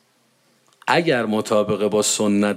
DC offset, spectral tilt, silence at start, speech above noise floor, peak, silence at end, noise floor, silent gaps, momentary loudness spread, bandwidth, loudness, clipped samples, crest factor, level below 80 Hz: under 0.1%; -4 dB/octave; 0.85 s; 43 dB; -4 dBFS; 0 s; -61 dBFS; none; 2 LU; 16 kHz; -19 LUFS; under 0.1%; 18 dB; -70 dBFS